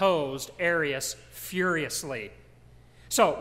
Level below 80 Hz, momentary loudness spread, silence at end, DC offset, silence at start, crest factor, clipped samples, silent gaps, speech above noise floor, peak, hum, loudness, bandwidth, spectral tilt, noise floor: -58 dBFS; 12 LU; 0 s; under 0.1%; 0 s; 20 dB; under 0.1%; none; 26 dB; -10 dBFS; none; -28 LUFS; 16 kHz; -3 dB/octave; -54 dBFS